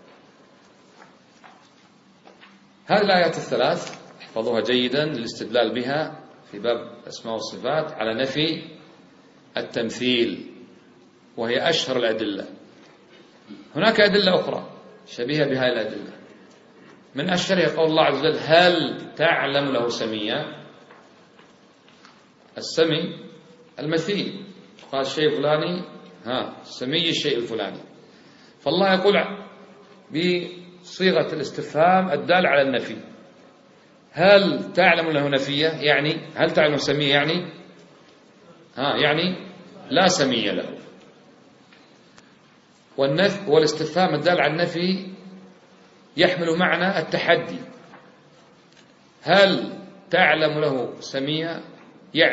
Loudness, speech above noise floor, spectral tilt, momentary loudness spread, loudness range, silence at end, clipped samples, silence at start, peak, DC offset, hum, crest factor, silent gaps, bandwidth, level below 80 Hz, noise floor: -21 LUFS; 33 dB; -4.5 dB/octave; 18 LU; 7 LU; 0 s; under 0.1%; 1.45 s; 0 dBFS; under 0.1%; none; 24 dB; none; 8 kHz; -66 dBFS; -54 dBFS